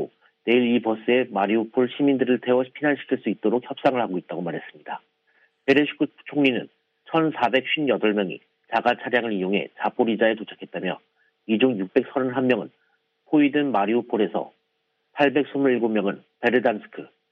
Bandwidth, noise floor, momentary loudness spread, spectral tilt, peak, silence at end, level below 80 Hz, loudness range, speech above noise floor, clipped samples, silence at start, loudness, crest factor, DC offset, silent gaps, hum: 6.4 kHz; -73 dBFS; 12 LU; -7.5 dB/octave; -4 dBFS; 0.25 s; -74 dBFS; 3 LU; 51 dB; under 0.1%; 0 s; -23 LUFS; 18 dB; under 0.1%; none; none